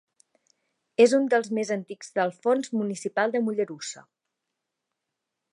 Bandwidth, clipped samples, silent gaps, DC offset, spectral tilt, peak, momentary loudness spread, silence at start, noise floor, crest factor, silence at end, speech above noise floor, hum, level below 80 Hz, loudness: 11.5 kHz; under 0.1%; none; under 0.1%; -4.5 dB/octave; -6 dBFS; 13 LU; 1 s; -84 dBFS; 20 dB; 1.5 s; 59 dB; none; -84 dBFS; -25 LUFS